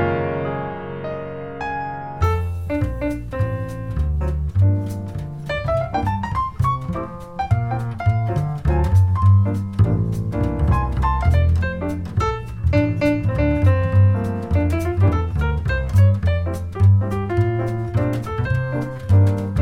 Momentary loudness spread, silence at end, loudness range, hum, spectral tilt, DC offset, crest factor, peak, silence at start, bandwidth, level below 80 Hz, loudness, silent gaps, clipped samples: 11 LU; 0 s; 5 LU; none; -8.5 dB/octave; 0.6%; 14 dB; -4 dBFS; 0 s; 6.6 kHz; -28 dBFS; -20 LUFS; none; under 0.1%